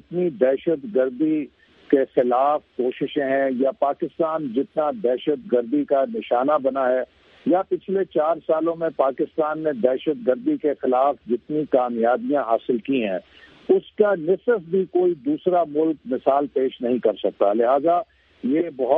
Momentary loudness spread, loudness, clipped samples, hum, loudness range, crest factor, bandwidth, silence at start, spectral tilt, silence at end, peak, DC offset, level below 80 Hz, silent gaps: 5 LU; -22 LUFS; under 0.1%; none; 1 LU; 18 dB; 4.2 kHz; 0.1 s; -9.5 dB/octave; 0 s; -2 dBFS; under 0.1%; -66 dBFS; none